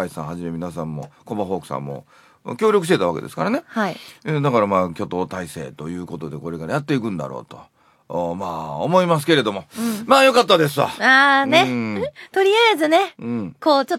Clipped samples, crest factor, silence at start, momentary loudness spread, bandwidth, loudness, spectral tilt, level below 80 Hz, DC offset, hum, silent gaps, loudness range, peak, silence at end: under 0.1%; 20 dB; 0 s; 17 LU; 16.5 kHz; -19 LUFS; -5 dB/octave; -58 dBFS; under 0.1%; none; none; 11 LU; 0 dBFS; 0 s